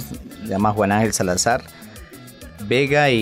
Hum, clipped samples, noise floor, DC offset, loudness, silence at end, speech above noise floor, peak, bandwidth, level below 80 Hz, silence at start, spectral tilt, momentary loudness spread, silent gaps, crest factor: none; under 0.1%; -40 dBFS; under 0.1%; -19 LUFS; 0 s; 22 dB; -6 dBFS; 16 kHz; -46 dBFS; 0 s; -4.5 dB/octave; 23 LU; none; 14 dB